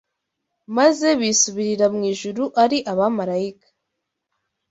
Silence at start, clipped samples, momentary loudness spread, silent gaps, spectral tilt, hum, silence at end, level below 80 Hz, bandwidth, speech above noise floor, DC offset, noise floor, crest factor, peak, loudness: 0.7 s; under 0.1%; 8 LU; none; -3 dB/octave; none; 1.2 s; -66 dBFS; 8 kHz; 60 dB; under 0.1%; -79 dBFS; 18 dB; -4 dBFS; -19 LUFS